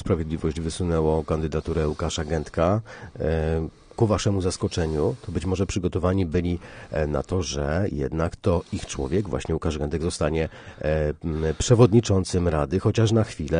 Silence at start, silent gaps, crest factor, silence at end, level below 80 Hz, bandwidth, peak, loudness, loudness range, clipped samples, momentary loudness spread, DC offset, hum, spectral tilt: 0 s; none; 20 dB; 0 s; -36 dBFS; 10 kHz; -4 dBFS; -25 LUFS; 4 LU; under 0.1%; 7 LU; under 0.1%; none; -6.5 dB/octave